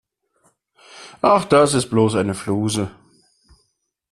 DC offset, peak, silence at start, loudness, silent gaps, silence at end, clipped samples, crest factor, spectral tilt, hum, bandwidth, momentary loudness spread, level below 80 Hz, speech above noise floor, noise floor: under 0.1%; -2 dBFS; 0.95 s; -18 LUFS; none; 1.2 s; under 0.1%; 18 dB; -5.5 dB/octave; none; 14 kHz; 15 LU; -54 dBFS; 52 dB; -70 dBFS